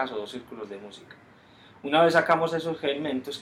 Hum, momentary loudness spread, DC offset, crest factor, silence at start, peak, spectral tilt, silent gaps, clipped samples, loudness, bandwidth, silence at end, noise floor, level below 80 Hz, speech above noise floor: none; 20 LU; under 0.1%; 22 dB; 0 s; -6 dBFS; -5 dB/octave; none; under 0.1%; -25 LUFS; 14.5 kHz; 0 s; -53 dBFS; -70 dBFS; 27 dB